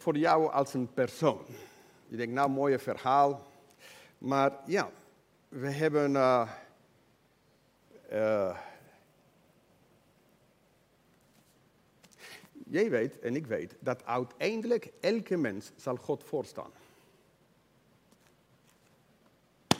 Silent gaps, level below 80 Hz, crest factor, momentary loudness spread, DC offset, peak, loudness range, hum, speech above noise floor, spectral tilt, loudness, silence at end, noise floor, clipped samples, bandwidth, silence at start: none; -78 dBFS; 28 dB; 23 LU; under 0.1%; -4 dBFS; 9 LU; none; 37 dB; -5.5 dB/octave; -31 LUFS; 0 s; -68 dBFS; under 0.1%; 16 kHz; 0 s